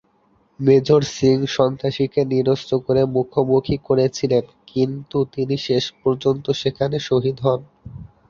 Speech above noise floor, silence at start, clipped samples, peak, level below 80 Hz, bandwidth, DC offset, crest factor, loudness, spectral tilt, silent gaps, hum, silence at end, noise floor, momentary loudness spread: 41 dB; 0.6 s; under 0.1%; -2 dBFS; -50 dBFS; 7.2 kHz; under 0.1%; 16 dB; -20 LUFS; -6.5 dB/octave; none; none; 0.25 s; -60 dBFS; 7 LU